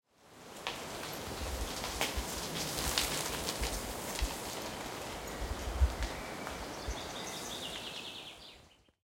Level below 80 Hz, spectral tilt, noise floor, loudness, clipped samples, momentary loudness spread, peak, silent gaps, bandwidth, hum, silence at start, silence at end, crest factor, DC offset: -44 dBFS; -3 dB/octave; -61 dBFS; -38 LUFS; under 0.1%; 9 LU; -10 dBFS; none; 17 kHz; none; 0.2 s; 0.35 s; 30 dB; under 0.1%